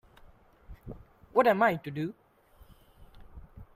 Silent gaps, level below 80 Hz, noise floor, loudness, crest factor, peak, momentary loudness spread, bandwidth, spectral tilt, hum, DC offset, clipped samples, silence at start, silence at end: none; -56 dBFS; -58 dBFS; -28 LUFS; 24 dB; -10 dBFS; 27 LU; 16 kHz; -7 dB/octave; none; under 0.1%; under 0.1%; 0.7 s; 0.1 s